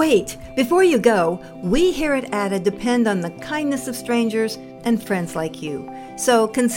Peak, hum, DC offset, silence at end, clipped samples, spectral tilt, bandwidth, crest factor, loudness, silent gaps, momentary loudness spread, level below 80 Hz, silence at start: -2 dBFS; none; under 0.1%; 0 s; under 0.1%; -4.5 dB/octave; 17 kHz; 18 dB; -20 LUFS; none; 11 LU; -42 dBFS; 0 s